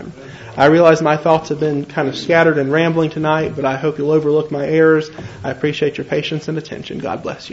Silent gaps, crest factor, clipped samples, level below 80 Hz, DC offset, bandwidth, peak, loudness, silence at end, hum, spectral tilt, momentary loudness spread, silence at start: none; 16 dB; under 0.1%; -52 dBFS; under 0.1%; 8 kHz; 0 dBFS; -16 LUFS; 0 s; none; -6.5 dB/octave; 13 LU; 0 s